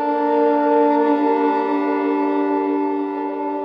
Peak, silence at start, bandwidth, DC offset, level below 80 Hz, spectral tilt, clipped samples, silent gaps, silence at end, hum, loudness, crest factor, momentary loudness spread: -6 dBFS; 0 s; 5.4 kHz; under 0.1%; -76 dBFS; -7 dB/octave; under 0.1%; none; 0 s; none; -18 LUFS; 12 dB; 7 LU